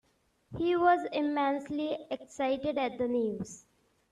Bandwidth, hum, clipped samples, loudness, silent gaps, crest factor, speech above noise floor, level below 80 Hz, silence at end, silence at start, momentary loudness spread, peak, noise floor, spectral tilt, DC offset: 10.5 kHz; none; under 0.1%; -31 LUFS; none; 18 dB; 38 dB; -64 dBFS; 0.5 s; 0.5 s; 14 LU; -14 dBFS; -69 dBFS; -5.5 dB/octave; under 0.1%